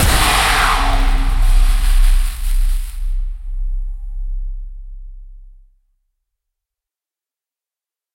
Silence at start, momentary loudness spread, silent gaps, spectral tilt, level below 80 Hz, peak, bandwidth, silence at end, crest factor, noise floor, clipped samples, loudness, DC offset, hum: 0 s; 20 LU; none; -3 dB/octave; -16 dBFS; -2 dBFS; 16.5 kHz; 2.7 s; 14 dB; -90 dBFS; under 0.1%; -18 LUFS; under 0.1%; none